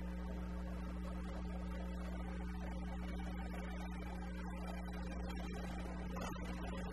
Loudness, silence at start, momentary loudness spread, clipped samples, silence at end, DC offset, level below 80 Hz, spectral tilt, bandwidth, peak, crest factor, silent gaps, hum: -46 LUFS; 0 s; 1 LU; under 0.1%; 0 s; 0.1%; -46 dBFS; -6.5 dB/octave; 13 kHz; -30 dBFS; 14 dB; none; none